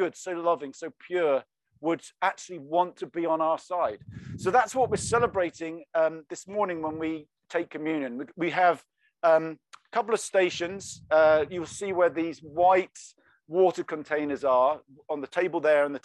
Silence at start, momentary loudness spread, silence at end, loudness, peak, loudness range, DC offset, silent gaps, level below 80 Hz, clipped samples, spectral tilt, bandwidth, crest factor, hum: 0 s; 12 LU; 0.05 s; -27 LUFS; -10 dBFS; 4 LU; under 0.1%; none; -64 dBFS; under 0.1%; -4.5 dB/octave; 12 kHz; 18 dB; none